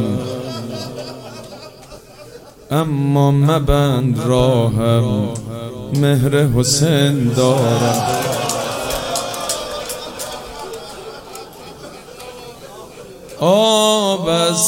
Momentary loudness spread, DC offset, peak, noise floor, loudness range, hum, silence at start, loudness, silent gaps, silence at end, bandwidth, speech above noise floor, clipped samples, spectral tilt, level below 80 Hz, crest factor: 21 LU; under 0.1%; 0 dBFS; -39 dBFS; 11 LU; none; 0 s; -16 LUFS; none; 0 s; 17 kHz; 24 dB; under 0.1%; -5 dB/octave; -36 dBFS; 16 dB